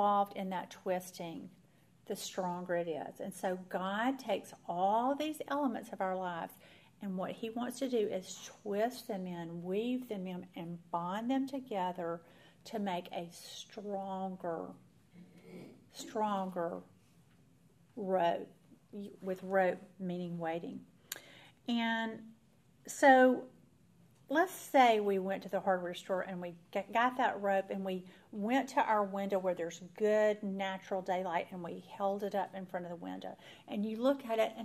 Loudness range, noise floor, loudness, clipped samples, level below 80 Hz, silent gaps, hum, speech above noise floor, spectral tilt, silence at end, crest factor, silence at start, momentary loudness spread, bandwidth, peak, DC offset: 9 LU; -67 dBFS; -36 LUFS; under 0.1%; -82 dBFS; none; none; 32 dB; -5 dB/octave; 0 s; 22 dB; 0 s; 15 LU; 15.5 kHz; -14 dBFS; under 0.1%